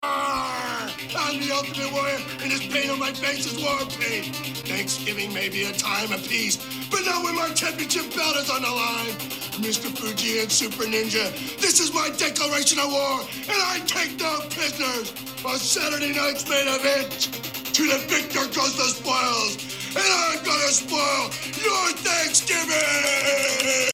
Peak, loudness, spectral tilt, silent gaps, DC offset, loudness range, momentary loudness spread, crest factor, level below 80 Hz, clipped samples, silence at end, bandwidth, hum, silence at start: -2 dBFS; -23 LUFS; -1 dB/octave; none; under 0.1%; 4 LU; 8 LU; 22 dB; -60 dBFS; under 0.1%; 0 s; 19.5 kHz; none; 0 s